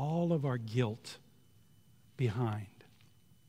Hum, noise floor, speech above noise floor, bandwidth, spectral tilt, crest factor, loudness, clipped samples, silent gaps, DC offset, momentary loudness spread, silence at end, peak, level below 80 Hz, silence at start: none; -65 dBFS; 31 dB; 14.5 kHz; -7.5 dB/octave; 18 dB; -35 LUFS; under 0.1%; none; under 0.1%; 20 LU; 0.65 s; -18 dBFS; -76 dBFS; 0 s